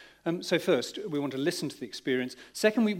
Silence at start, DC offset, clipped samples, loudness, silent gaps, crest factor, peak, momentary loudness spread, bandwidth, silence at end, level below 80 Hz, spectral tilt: 0 s; under 0.1%; under 0.1%; -30 LUFS; none; 20 dB; -10 dBFS; 9 LU; 16.5 kHz; 0 s; -74 dBFS; -4.5 dB/octave